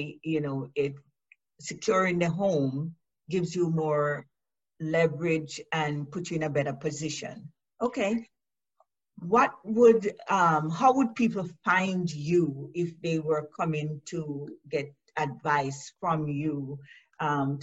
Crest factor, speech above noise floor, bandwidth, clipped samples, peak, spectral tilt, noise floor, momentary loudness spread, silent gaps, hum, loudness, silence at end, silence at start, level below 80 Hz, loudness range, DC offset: 20 dB; 44 dB; 8.2 kHz; under 0.1%; -10 dBFS; -6 dB/octave; -71 dBFS; 12 LU; none; none; -28 LUFS; 0 s; 0 s; -68 dBFS; 7 LU; under 0.1%